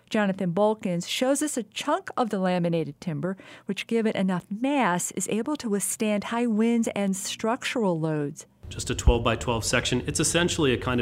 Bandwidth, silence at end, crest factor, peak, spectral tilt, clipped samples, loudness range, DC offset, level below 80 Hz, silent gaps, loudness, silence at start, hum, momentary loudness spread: 16 kHz; 0 s; 20 dB; -6 dBFS; -4.5 dB/octave; under 0.1%; 2 LU; under 0.1%; -38 dBFS; none; -26 LUFS; 0.1 s; none; 8 LU